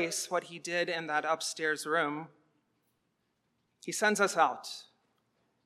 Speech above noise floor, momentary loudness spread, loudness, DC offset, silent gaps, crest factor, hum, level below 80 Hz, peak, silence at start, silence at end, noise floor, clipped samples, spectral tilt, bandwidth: 47 dB; 16 LU; -31 LUFS; under 0.1%; none; 22 dB; none; under -90 dBFS; -12 dBFS; 0 s; 0.85 s; -78 dBFS; under 0.1%; -2.5 dB/octave; 16 kHz